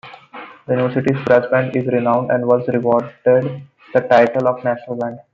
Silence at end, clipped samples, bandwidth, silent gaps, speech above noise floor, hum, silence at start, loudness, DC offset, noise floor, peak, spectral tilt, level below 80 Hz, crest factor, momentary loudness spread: 0.1 s; under 0.1%; 7.2 kHz; none; 21 dB; none; 0.05 s; -17 LUFS; under 0.1%; -37 dBFS; 0 dBFS; -8.5 dB/octave; -60 dBFS; 16 dB; 14 LU